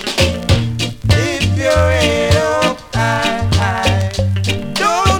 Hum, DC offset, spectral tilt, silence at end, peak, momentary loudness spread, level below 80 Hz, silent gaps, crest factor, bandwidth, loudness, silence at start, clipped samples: none; under 0.1%; -5 dB/octave; 0 s; 0 dBFS; 5 LU; -28 dBFS; none; 14 dB; 18 kHz; -15 LUFS; 0 s; under 0.1%